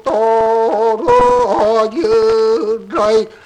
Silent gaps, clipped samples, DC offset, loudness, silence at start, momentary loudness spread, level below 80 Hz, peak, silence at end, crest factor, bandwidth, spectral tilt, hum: none; under 0.1%; under 0.1%; -13 LUFS; 0.05 s; 4 LU; -40 dBFS; -2 dBFS; 0.1 s; 10 dB; 9.8 kHz; -5 dB/octave; none